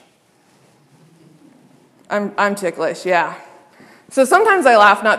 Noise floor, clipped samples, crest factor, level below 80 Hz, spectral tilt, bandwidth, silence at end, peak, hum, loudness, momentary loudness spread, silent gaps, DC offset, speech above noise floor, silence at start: -55 dBFS; under 0.1%; 18 dB; -66 dBFS; -3.5 dB/octave; 15 kHz; 0 s; 0 dBFS; none; -15 LUFS; 14 LU; none; under 0.1%; 41 dB; 2.1 s